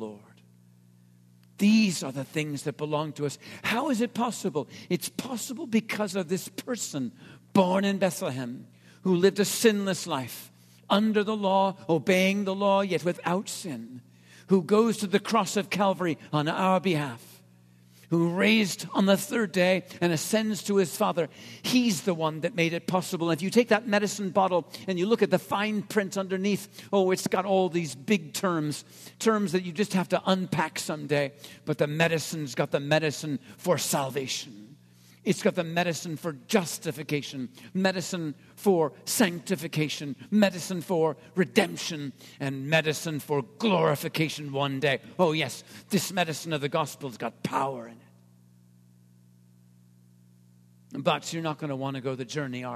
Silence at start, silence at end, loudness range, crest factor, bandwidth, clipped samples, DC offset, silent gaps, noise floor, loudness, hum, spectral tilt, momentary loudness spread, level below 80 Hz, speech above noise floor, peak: 0 s; 0 s; 5 LU; 22 dB; 14 kHz; under 0.1%; under 0.1%; none; -57 dBFS; -27 LUFS; 60 Hz at -55 dBFS; -5 dB/octave; 10 LU; -74 dBFS; 30 dB; -6 dBFS